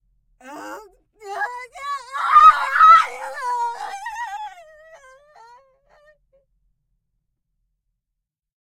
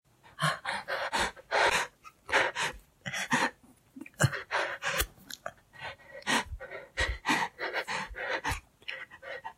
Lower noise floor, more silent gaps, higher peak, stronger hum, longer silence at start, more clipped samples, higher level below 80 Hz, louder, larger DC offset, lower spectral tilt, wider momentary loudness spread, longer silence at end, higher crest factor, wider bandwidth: first, -82 dBFS vs -55 dBFS; neither; first, 0 dBFS vs -12 dBFS; neither; first, 0.45 s vs 0.25 s; neither; second, -60 dBFS vs -50 dBFS; first, -15 LUFS vs -31 LUFS; neither; second, -0.5 dB/octave vs -3 dB/octave; first, 25 LU vs 16 LU; first, 4.2 s vs 0.05 s; about the same, 20 dB vs 22 dB; second, 13.5 kHz vs 16 kHz